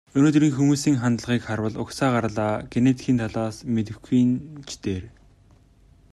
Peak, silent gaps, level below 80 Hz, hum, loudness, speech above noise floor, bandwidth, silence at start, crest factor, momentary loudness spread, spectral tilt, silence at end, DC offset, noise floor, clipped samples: -6 dBFS; none; -52 dBFS; none; -23 LUFS; 32 dB; 12.5 kHz; 0.15 s; 16 dB; 11 LU; -6.5 dB/octave; 1.05 s; under 0.1%; -55 dBFS; under 0.1%